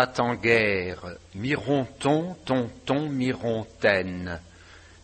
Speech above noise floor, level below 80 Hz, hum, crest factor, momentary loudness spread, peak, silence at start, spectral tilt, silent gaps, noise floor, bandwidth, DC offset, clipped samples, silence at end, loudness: 24 dB; -54 dBFS; none; 22 dB; 13 LU; -4 dBFS; 0 s; -6 dB/octave; none; -50 dBFS; 8.4 kHz; under 0.1%; under 0.1%; 0.25 s; -26 LUFS